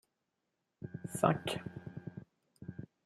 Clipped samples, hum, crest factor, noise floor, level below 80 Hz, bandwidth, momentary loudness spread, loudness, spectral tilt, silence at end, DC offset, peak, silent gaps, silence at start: under 0.1%; none; 28 dB; -85 dBFS; -72 dBFS; 14 kHz; 20 LU; -37 LUFS; -5.5 dB/octave; 0.2 s; under 0.1%; -12 dBFS; none; 0.8 s